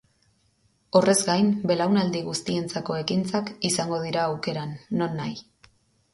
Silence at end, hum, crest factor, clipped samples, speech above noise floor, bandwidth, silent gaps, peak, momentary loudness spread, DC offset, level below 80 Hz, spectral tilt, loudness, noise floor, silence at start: 0.75 s; none; 22 dB; under 0.1%; 42 dB; 12 kHz; none; -4 dBFS; 10 LU; under 0.1%; -62 dBFS; -4.5 dB/octave; -25 LUFS; -66 dBFS; 0.95 s